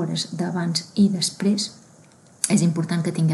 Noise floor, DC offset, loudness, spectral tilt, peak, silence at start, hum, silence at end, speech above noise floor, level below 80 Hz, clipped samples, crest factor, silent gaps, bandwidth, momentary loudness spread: -51 dBFS; under 0.1%; -22 LUFS; -5 dB/octave; -2 dBFS; 0 s; none; 0 s; 30 dB; -68 dBFS; under 0.1%; 20 dB; none; 12.5 kHz; 6 LU